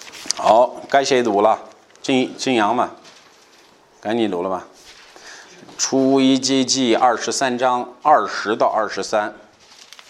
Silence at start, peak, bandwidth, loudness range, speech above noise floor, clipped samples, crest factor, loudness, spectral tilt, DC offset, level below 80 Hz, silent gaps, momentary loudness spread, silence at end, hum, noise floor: 0 s; 0 dBFS; 12.5 kHz; 6 LU; 33 dB; under 0.1%; 20 dB; -18 LUFS; -3 dB/octave; under 0.1%; -66 dBFS; none; 11 LU; 0.7 s; none; -51 dBFS